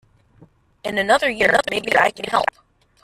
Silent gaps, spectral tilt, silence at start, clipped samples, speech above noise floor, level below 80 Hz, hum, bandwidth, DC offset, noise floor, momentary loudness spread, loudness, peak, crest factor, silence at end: none; -3 dB/octave; 0.85 s; under 0.1%; 34 dB; -54 dBFS; none; 14.5 kHz; under 0.1%; -52 dBFS; 9 LU; -18 LUFS; -2 dBFS; 20 dB; 0.6 s